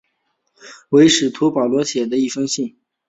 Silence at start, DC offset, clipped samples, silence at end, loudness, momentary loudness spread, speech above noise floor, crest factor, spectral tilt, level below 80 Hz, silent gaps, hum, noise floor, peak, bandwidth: 0.65 s; under 0.1%; under 0.1%; 0.4 s; -16 LUFS; 10 LU; 54 dB; 16 dB; -4 dB/octave; -58 dBFS; none; none; -69 dBFS; -2 dBFS; 8.4 kHz